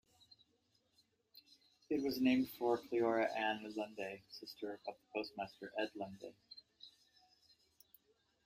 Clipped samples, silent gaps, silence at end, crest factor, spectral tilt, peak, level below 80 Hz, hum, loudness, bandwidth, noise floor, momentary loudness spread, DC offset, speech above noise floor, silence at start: under 0.1%; none; 1.6 s; 20 dB; -5 dB/octave; -22 dBFS; -80 dBFS; none; -40 LUFS; 15.5 kHz; -79 dBFS; 21 LU; under 0.1%; 39 dB; 1.35 s